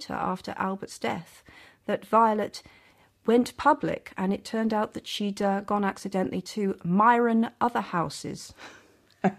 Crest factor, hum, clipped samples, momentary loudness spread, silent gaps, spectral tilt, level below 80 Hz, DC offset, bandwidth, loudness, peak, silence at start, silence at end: 20 dB; none; under 0.1%; 14 LU; none; -6 dB/octave; -62 dBFS; under 0.1%; 14.5 kHz; -27 LUFS; -8 dBFS; 0 s; 0 s